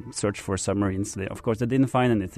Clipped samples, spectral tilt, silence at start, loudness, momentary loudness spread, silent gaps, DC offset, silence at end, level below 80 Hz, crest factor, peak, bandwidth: under 0.1%; -6 dB/octave; 0 s; -26 LUFS; 8 LU; none; under 0.1%; 0 s; -50 dBFS; 14 dB; -10 dBFS; 13.5 kHz